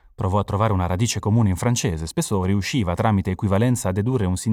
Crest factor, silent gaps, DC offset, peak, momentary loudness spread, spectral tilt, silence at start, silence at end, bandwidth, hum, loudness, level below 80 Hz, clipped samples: 14 dB; none; under 0.1%; -6 dBFS; 3 LU; -6 dB/octave; 0.2 s; 0 s; 15.5 kHz; none; -21 LUFS; -42 dBFS; under 0.1%